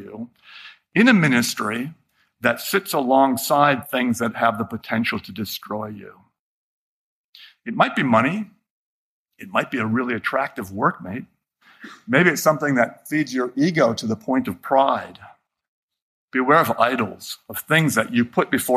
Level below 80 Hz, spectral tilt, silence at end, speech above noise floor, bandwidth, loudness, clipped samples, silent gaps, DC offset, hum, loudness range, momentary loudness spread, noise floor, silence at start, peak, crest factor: -64 dBFS; -5 dB/octave; 0 s; 33 dB; 15.5 kHz; -20 LUFS; under 0.1%; 6.39-7.33 s, 8.70-9.26 s, 15.68-15.89 s, 16.02-16.28 s; under 0.1%; none; 6 LU; 17 LU; -54 dBFS; 0 s; -2 dBFS; 20 dB